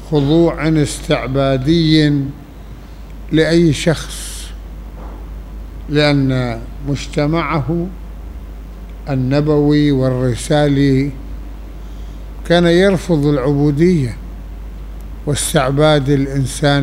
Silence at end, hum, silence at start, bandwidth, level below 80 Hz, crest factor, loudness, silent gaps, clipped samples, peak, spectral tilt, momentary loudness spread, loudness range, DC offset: 0 s; none; 0 s; 15.5 kHz; -28 dBFS; 14 dB; -15 LUFS; none; under 0.1%; 0 dBFS; -6 dB/octave; 20 LU; 4 LU; under 0.1%